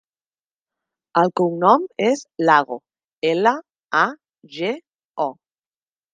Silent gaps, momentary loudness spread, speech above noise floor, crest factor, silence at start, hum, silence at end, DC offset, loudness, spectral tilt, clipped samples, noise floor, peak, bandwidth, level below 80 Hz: 3.18-3.22 s, 3.84-3.88 s, 4.95-4.99 s, 5.05-5.14 s; 14 LU; over 72 dB; 22 dB; 1.15 s; none; 0.8 s; under 0.1%; -20 LUFS; -5.5 dB/octave; under 0.1%; under -90 dBFS; 0 dBFS; 9.4 kHz; -76 dBFS